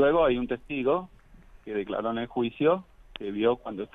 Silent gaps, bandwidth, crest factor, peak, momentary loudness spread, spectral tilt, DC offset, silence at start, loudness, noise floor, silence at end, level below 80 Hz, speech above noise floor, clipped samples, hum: none; 4 kHz; 16 dB; -10 dBFS; 13 LU; -8.5 dB/octave; under 0.1%; 0 s; -28 LUFS; -52 dBFS; 0.1 s; -52 dBFS; 26 dB; under 0.1%; none